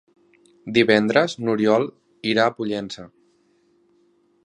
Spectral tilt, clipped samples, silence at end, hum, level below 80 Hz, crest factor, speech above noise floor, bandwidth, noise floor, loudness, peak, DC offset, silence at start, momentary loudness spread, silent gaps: -5.5 dB/octave; under 0.1%; 1.35 s; none; -64 dBFS; 22 dB; 42 dB; 10.5 kHz; -62 dBFS; -20 LUFS; -2 dBFS; under 0.1%; 0.65 s; 15 LU; none